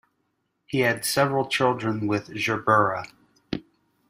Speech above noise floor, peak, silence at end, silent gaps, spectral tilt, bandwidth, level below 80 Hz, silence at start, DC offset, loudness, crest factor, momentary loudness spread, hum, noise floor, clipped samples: 51 dB; -4 dBFS; 0.5 s; none; -4.5 dB/octave; 15.5 kHz; -60 dBFS; 0.7 s; under 0.1%; -24 LUFS; 20 dB; 14 LU; none; -74 dBFS; under 0.1%